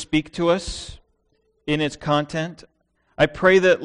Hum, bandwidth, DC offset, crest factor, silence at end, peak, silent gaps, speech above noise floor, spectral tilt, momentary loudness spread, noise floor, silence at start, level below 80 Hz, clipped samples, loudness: none; 10.5 kHz; under 0.1%; 20 dB; 0 s; -2 dBFS; none; 46 dB; -5 dB/octave; 17 LU; -67 dBFS; 0 s; -44 dBFS; under 0.1%; -21 LUFS